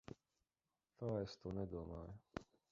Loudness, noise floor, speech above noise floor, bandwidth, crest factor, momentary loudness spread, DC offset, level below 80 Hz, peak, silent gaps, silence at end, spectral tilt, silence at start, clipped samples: -49 LUFS; under -90 dBFS; over 43 dB; 7.6 kHz; 24 dB; 11 LU; under 0.1%; -64 dBFS; -26 dBFS; none; 0.25 s; -7 dB/octave; 0.1 s; under 0.1%